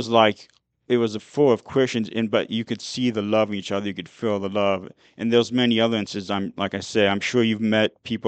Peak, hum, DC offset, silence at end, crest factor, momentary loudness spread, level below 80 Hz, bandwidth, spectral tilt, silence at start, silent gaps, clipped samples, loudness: -2 dBFS; none; under 0.1%; 0 s; 20 dB; 8 LU; -64 dBFS; 8.8 kHz; -5.5 dB/octave; 0 s; none; under 0.1%; -23 LUFS